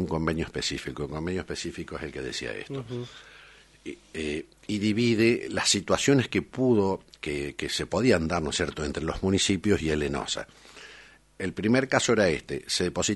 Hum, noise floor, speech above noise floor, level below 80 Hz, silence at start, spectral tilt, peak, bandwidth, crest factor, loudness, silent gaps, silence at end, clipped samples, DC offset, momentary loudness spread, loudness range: none; -52 dBFS; 25 dB; -48 dBFS; 0 s; -4.5 dB/octave; -6 dBFS; 11.5 kHz; 22 dB; -27 LUFS; none; 0 s; under 0.1%; under 0.1%; 14 LU; 10 LU